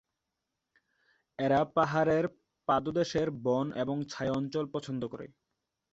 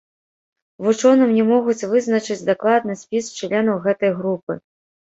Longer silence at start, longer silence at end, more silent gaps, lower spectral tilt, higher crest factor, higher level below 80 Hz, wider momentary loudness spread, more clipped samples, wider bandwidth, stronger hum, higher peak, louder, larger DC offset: first, 1.4 s vs 0.8 s; first, 0.65 s vs 0.5 s; second, none vs 4.43-4.47 s; about the same, -6.5 dB/octave vs -5.5 dB/octave; about the same, 20 dB vs 16 dB; about the same, -64 dBFS vs -66 dBFS; about the same, 12 LU vs 10 LU; neither; about the same, 8 kHz vs 8 kHz; neither; second, -12 dBFS vs -4 dBFS; second, -31 LUFS vs -19 LUFS; neither